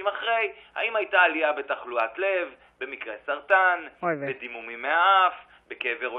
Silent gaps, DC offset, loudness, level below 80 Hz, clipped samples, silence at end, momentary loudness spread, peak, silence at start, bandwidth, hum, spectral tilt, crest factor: none; under 0.1%; -25 LUFS; -72 dBFS; under 0.1%; 0 s; 15 LU; -6 dBFS; 0 s; 4.8 kHz; none; -6.5 dB/octave; 18 dB